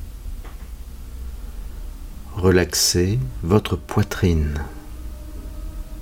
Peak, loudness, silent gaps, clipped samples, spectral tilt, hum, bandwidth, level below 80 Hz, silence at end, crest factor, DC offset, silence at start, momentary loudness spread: -2 dBFS; -20 LUFS; none; under 0.1%; -4.5 dB/octave; none; 17 kHz; -32 dBFS; 0 s; 22 dB; under 0.1%; 0 s; 21 LU